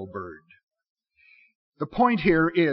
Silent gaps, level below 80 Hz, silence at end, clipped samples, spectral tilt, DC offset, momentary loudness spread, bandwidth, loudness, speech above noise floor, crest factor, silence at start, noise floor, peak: 0.63-0.67 s, 0.90-0.96 s, 1.55-1.72 s; -52 dBFS; 0 s; under 0.1%; -5 dB/octave; under 0.1%; 17 LU; 5.6 kHz; -23 LUFS; 36 dB; 18 dB; 0 s; -59 dBFS; -8 dBFS